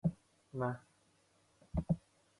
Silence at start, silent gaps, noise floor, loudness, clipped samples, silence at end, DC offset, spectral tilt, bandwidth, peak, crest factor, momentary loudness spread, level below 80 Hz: 0.05 s; none; -72 dBFS; -41 LUFS; under 0.1%; 0.4 s; under 0.1%; -9.5 dB/octave; 11 kHz; -22 dBFS; 20 dB; 10 LU; -54 dBFS